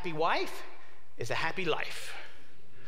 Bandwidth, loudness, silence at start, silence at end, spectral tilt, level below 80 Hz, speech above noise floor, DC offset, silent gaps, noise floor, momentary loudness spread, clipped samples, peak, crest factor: 16 kHz; -34 LUFS; 0 s; 0 s; -4 dB/octave; -66 dBFS; 24 dB; 3%; none; -58 dBFS; 16 LU; under 0.1%; -14 dBFS; 20 dB